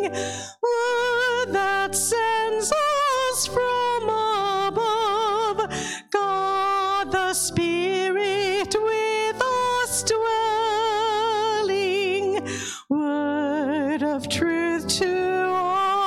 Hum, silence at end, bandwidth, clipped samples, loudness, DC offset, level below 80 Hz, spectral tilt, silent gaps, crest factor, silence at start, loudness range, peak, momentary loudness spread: none; 0 s; 16.5 kHz; under 0.1%; -23 LUFS; under 0.1%; -56 dBFS; -2.5 dB/octave; none; 16 dB; 0 s; 2 LU; -8 dBFS; 4 LU